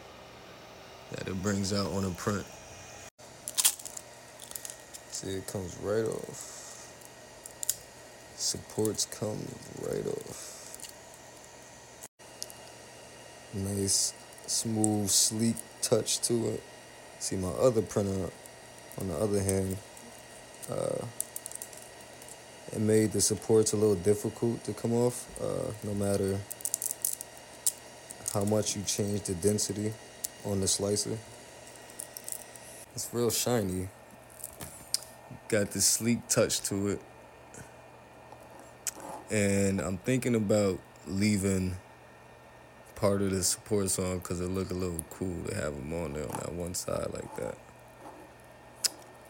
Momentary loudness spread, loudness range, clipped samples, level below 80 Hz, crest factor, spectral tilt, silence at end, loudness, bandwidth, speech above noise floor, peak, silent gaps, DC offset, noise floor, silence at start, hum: 22 LU; 8 LU; under 0.1%; -60 dBFS; 26 dB; -4 dB/octave; 0 s; -31 LUFS; 17 kHz; 23 dB; -8 dBFS; 3.11-3.18 s, 12.08-12.18 s; under 0.1%; -53 dBFS; 0 s; none